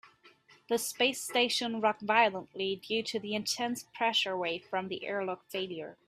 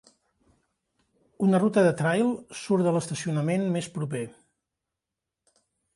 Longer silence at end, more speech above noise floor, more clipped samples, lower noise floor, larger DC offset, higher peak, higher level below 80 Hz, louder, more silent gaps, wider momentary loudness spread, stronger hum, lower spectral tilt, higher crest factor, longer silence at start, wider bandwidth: second, 0.15 s vs 1.65 s; second, 29 dB vs 62 dB; neither; second, -61 dBFS vs -87 dBFS; neither; about the same, -10 dBFS vs -10 dBFS; second, -78 dBFS vs -70 dBFS; second, -31 LUFS vs -26 LUFS; neither; about the same, 9 LU vs 11 LU; neither; second, -2.5 dB/octave vs -6.5 dB/octave; first, 22 dB vs 16 dB; second, 0.05 s vs 1.4 s; first, 15.5 kHz vs 11.5 kHz